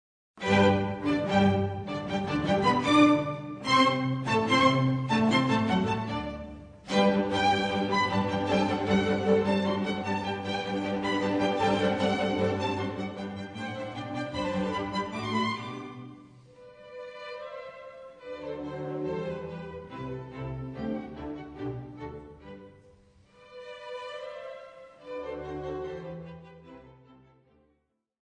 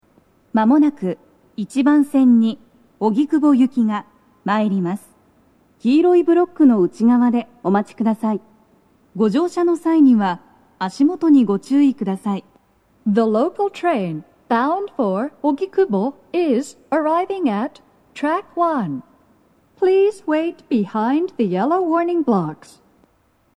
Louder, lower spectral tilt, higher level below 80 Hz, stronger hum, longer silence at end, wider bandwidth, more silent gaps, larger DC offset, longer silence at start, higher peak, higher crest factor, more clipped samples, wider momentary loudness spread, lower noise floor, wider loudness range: second, -28 LUFS vs -18 LUFS; second, -6 dB/octave vs -7.5 dB/octave; first, -56 dBFS vs -68 dBFS; neither; first, 1.35 s vs 1 s; second, 10 kHz vs 11.5 kHz; neither; neither; second, 0.35 s vs 0.55 s; second, -8 dBFS vs -4 dBFS; first, 20 dB vs 14 dB; neither; first, 20 LU vs 12 LU; first, -75 dBFS vs -60 dBFS; first, 16 LU vs 4 LU